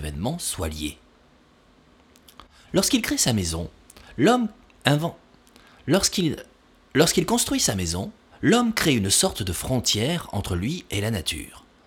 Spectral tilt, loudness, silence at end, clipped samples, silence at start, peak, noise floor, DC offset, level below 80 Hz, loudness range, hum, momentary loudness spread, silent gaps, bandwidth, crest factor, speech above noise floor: -3.5 dB/octave; -23 LUFS; 0.25 s; under 0.1%; 0 s; -2 dBFS; -57 dBFS; under 0.1%; -44 dBFS; 5 LU; none; 13 LU; none; 19.5 kHz; 22 dB; 34 dB